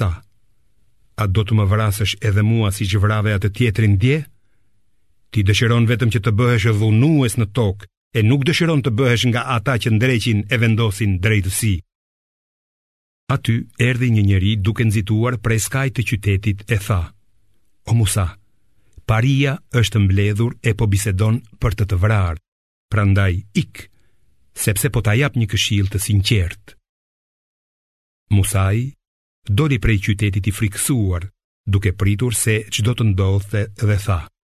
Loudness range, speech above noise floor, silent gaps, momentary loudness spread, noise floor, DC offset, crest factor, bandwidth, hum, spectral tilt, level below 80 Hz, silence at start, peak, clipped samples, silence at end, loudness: 4 LU; 49 dB; 7.97-8.11 s, 11.95-13.27 s, 22.48-22.89 s, 26.89-28.26 s, 29.07-29.42 s, 31.44-31.64 s; 8 LU; -66 dBFS; 0.3%; 16 dB; 14 kHz; none; -5.5 dB/octave; -32 dBFS; 0 s; -2 dBFS; under 0.1%; 0.3 s; -18 LUFS